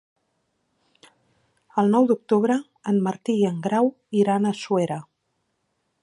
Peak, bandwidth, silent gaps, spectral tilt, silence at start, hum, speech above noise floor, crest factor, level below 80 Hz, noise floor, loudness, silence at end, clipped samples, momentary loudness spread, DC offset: -8 dBFS; 11 kHz; none; -7 dB/octave; 1.75 s; none; 53 dB; 16 dB; -74 dBFS; -74 dBFS; -22 LUFS; 1 s; under 0.1%; 6 LU; under 0.1%